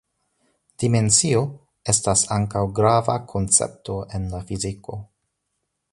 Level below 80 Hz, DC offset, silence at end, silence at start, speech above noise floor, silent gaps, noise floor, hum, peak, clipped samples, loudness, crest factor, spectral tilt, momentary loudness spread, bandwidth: -44 dBFS; under 0.1%; 0.9 s; 0.8 s; 55 dB; none; -77 dBFS; none; -2 dBFS; under 0.1%; -21 LUFS; 22 dB; -4 dB/octave; 14 LU; 11.5 kHz